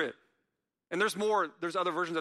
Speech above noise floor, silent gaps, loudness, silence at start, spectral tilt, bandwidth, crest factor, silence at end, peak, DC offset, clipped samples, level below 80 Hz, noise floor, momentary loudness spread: 53 dB; none; -32 LUFS; 0 s; -4 dB/octave; 13 kHz; 16 dB; 0 s; -16 dBFS; under 0.1%; under 0.1%; -84 dBFS; -84 dBFS; 6 LU